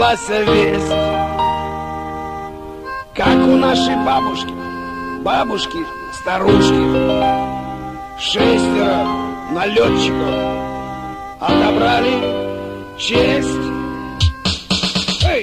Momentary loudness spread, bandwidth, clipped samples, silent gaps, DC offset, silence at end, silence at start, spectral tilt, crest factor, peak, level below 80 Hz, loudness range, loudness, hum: 13 LU; 14.5 kHz; under 0.1%; none; under 0.1%; 0 s; 0 s; -5 dB/octave; 16 dB; -2 dBFS; -34 dBFS; 2 LU; -17 LUFS; none